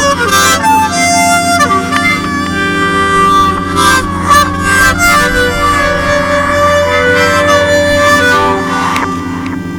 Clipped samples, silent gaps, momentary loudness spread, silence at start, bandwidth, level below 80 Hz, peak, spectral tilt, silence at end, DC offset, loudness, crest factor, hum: 0.2%; none; 5 LU; 0 s; over 20 kHz; -28 dBFS; 0 dBFS; -3.5 dB/octave; 0 s; under 0.1%; -9 LUFS; 10 dB; none